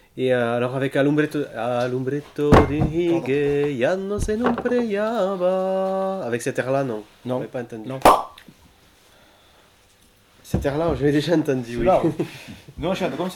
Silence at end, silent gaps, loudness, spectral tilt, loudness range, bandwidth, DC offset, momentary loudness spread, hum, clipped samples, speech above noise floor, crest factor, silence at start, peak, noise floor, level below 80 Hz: 0 s; none; -22 LUFS; -6.5 dB/octave; 4 LU; 19 kHz; under 0.1%; 12 LU; none; under 0.1%; 35 dB; 18 dB; 0.15 s; -4 dBFS; -56 dBFS; -40 dBFS